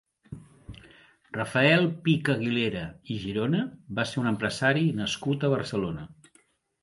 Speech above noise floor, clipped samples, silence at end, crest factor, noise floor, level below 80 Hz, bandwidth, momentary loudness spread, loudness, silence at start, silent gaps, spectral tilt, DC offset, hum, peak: 38 dB; under 0.1%; 0.7 s; 20 dB; -65 dBFS; -58 dBFS; 11.5 kHz; 23 LU; -27 LUFS; 0.3 s; none; -6 dB/octave; under 0.1%; none; -8 dBFS